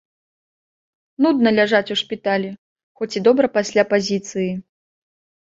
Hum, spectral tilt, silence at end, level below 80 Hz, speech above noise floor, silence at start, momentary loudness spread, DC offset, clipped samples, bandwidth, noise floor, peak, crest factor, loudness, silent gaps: none; -5 dB/octave; 0.95 s; -64 dBFS; over 72 dB; 1.2 s; 11 LU; under 0.1%; under 0.1%; 7.8 kHz; under -90 dBFS; -2 dBFS; 18 dB; -19 LUFS; 2.58-2.76 s, 2.83-2.95 s